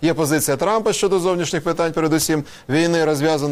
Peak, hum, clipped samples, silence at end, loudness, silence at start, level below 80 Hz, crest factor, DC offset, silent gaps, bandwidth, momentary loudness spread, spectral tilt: -6 dBFS; none; under 0.1%; 0 s; -19 LUFS; 0 s; -50 dBFS; 12 dB; 0.1%; none; 16 kHz; 3 LU; -4.5 dB/octave